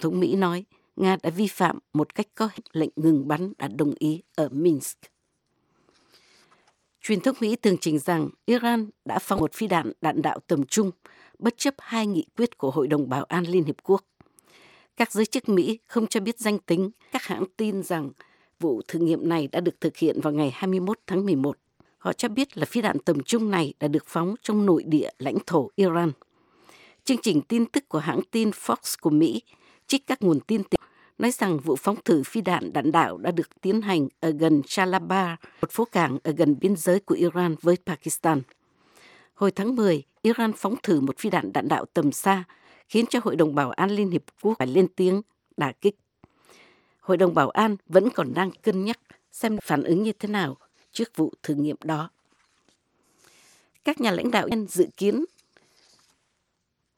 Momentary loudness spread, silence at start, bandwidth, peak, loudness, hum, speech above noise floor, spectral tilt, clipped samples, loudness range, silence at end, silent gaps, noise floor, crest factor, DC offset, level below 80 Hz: 7 LU; 0 s; 17.5 kHz; -4 dBFS; -25 LUFS; none; 53 dB; -5.5 dB/octave; under 0.1%; 4 LU; 1.7 s; none; -77 dBFS; 22 dB; under 0.1%; -64 dBFS